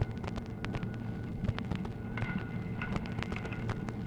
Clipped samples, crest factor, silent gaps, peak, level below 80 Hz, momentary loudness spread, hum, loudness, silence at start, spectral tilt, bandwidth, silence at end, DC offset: under 0.1%; 20 dB; none; -16 dBFS; -46 dBFS; 3 LU; none; -38 LUFS; 0 s; -7.5 dB/octave; 10.5 kHz; 0 s; under 0.1%